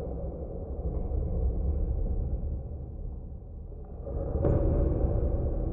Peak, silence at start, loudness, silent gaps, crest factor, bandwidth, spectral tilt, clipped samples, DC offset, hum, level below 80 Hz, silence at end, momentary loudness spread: -14 dBFS; 0 s; -32 LUFS; none; 16 dB; 2.2 kHz; -14 dB/octave; under 0.1%; under 0.1%; none; -32 dBFS; 0 s; 15 LU